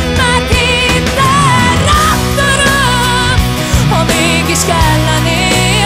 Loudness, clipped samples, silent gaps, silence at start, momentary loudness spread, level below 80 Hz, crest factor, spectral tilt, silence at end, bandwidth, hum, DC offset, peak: -9 LUFS; under 0.1%; none; 0 s; 2 LU; -20 dBFS; 10 dB; -4 dB/octave; 0 s; 16.5 kHz; none; under 0.1%; 0 dBFS